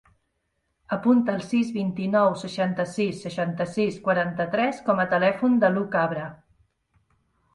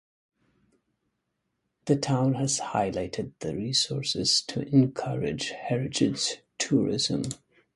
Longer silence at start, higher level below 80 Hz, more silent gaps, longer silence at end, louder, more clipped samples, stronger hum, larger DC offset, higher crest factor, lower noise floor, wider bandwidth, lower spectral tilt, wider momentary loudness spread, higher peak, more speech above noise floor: second, 0.9 s vs 1.85 s; second, -64 dBFS vs -58 dBFS; neither; first, 1.2 s vs 0.4 s; first, -24 LUFS vs -27 LUFS; neither; neither; neither; about the same, 18 dB vs 20 dB; second, -75 dBFS vs -79 dBFS; about the same, 11.5 kHz vs 11.5 kHz; first, -7 dB/octave vs -4.5 dB/octave; second, 7 LU vs 10 LU; first, -6 dBFS vs -10 dBFS; about the same, 52 dB vs 53 dB